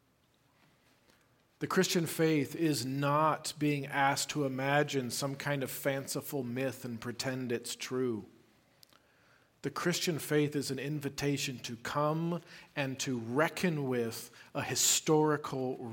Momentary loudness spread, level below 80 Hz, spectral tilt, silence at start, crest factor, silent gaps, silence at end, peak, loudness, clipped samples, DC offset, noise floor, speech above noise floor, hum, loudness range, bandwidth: 9 LU; -72 dBFS; -4 dB/octave; 1.6 s; 20 dB; none; 0 s; -14 dBFS; -33 LUFS; under 0.1%; under 0.1%; -71 dBFS; 38 dB; none; 6 LU; 17 kHz